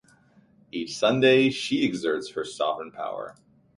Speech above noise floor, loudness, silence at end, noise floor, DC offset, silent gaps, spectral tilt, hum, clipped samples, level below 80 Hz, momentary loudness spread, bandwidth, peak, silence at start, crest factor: 34 dB; -25 LUFS; 0.45 s; -59 dBFS; under 0.1%; none; -5 dB/octave; none; under 0.1%; -66 dBFS; 16 LU; 11.5 kHz; -8 dBFS; 0.75 s; 18 dB